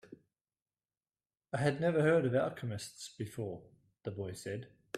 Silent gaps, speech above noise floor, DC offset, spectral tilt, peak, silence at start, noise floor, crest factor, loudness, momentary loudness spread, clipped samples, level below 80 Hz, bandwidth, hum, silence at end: 0.41-0.45 s, 0.62-0.66 s; over 55 dB; under 0.1%; -6.5 dB/octave; -16 dBFS; 0.1 s; under -90 dBFS; 20 dB; -35 LUFS; 16 LU; under 0.1%; -72 dBFS; 14.5 kHz; none; 0 s